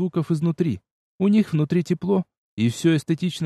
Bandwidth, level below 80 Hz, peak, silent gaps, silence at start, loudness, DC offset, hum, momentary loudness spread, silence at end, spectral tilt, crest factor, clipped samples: 12.5 kHz; -60 dBFS; -8 dBFS; 0.91-1.19 s, 2.37-2.57 s; 0 s; -22 LUFS; under 0.1%; none; 6 LU; 0 s; -7 dB/octave; 14 dB; under 0.1%